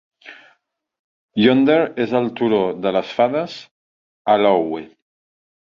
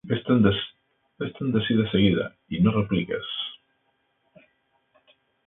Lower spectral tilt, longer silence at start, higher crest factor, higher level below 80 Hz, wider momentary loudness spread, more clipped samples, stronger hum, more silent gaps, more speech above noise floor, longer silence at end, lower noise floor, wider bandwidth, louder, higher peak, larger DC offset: second, -7 dB/octave vs -11 dB/octave; first, 0.25 s vs 0.05 s; about the same, 18 dB vs 20 dB; second, -62 dBFS vs -50 dBFS; about the same, 13 LU vs 13 LU; neither; neither; first, 0.99-1.29 s, 3.71-4.25 s vs none; about the same, 47 dB vs 48 dB; second, 0.95 s vs 1.95 s; second, -64 dBFS vs -71 dBFS; first, 7.2 kHz vs 4 kHz; first, -18 LUFS vs -24 LUFS; first, -2 dBFS vs -6 dBFS; neither